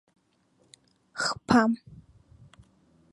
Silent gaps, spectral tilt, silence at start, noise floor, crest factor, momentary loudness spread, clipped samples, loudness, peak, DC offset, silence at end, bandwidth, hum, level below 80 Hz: none; -4.5 dB/octave; 1.15 s; -68 dBFS; 26 dB; 14 LU; under 0.1%; -26 LUFS; -6 dBFS; under 0.1%; 1.2 s; 11.5 kHz; none; -60 dBFS